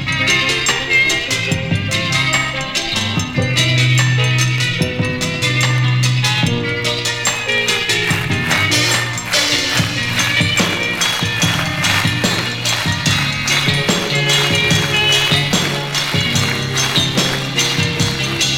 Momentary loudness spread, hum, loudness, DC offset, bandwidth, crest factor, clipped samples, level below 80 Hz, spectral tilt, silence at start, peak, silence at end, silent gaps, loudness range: 5 LU; none; -14 LUFS; 0.5%; 17 kHz; 14 dB; under 0.1%; -40 dBFS; -3 dB/octave; 0 s; -2 dBFS; 0 s; none; 2 LU